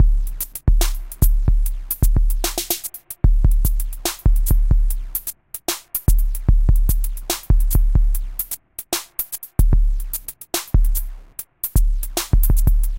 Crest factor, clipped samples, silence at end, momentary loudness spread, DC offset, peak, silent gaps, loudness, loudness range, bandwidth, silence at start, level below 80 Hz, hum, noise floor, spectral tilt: 16 dB; under 0.1%; 0 s; 8 LU; under 0.1%; 0 dBFS; none; -22 LUFS; 2 LU; 17.5 kHz; 0 s; -18 dBFS; none; -37 dBFS; -4.5 dB/octave